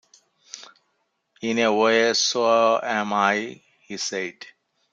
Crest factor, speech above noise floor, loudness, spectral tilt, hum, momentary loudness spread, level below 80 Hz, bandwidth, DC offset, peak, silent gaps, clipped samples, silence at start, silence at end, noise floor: 18 dB; 51 dB; -21 LUFS; -2.5 dB/octave; none; 21 LU; -74 dBFS; 9 kHz; under 0.1%; -4 dBFS; none; under 0.1%; 0.55 s; 0.45 s; -73 dBFS